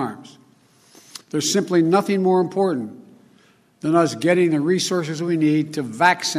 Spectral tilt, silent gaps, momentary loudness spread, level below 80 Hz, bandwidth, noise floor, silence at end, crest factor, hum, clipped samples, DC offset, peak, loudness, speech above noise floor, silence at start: -5 dB/octave; none; 12 LU; -70 dBFS; 14.5 kHz; -56 dBFS; 0 s; 18 dB; none; under 0.1%; under 0.1%; -2 dBFS; -20 LUFS; 37 dB; 0 s